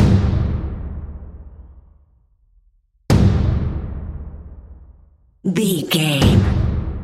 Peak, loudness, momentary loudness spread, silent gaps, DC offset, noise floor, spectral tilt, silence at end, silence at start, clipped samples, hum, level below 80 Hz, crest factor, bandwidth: 0 dBFS; -18 LUFS; 22 LU; none; under 0.1%; -58 dBFS; -6 dB/octave; 0 s; 0 s; under 0.1%; none; -26 dBFS; 18 dB; 15.5 kHz